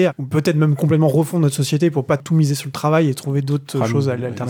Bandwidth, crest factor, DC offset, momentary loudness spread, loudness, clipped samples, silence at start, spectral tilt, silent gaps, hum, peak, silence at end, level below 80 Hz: 17 kHz; 14 dB; under 0.1%; 5 LU; -18 LUFS; under 0.1%; 0 s; -7 dB/octave; none; none; -2 dBFS; 0 s; -62 dBFS